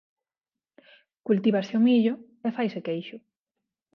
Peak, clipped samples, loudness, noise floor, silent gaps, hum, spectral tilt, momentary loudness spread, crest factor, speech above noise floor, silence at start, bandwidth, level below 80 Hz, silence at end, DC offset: -10 dBFS; under 0.1%; -25 LUFS; under -90 dBFS; none; none; -8 dB/octave; 13 LU; 18 dB; over 66 dB; 1.25 s; 6.2 kHz; -78 dBFS; 0.75 s; under 0.1%